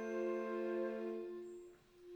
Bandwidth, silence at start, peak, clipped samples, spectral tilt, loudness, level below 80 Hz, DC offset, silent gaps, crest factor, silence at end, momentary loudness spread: 19 kHz; 0 s; -30 dBFS; under 0.1%; -6.5 dB/octave; -43 LUFS; -80 dBFS; under 0.1%; none; 12 dB; 0 s; 17 LU